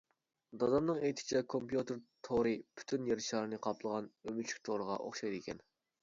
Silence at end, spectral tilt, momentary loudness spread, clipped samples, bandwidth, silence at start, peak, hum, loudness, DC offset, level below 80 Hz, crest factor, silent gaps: 0.45 s; -4.5 dB/octave; 10 LU; under 0.1%; 7.6 kHz; 0.5 s; -20 dBFS; none; -38 LUFS; under 0.1%; -70 dBFS; 18 dB; none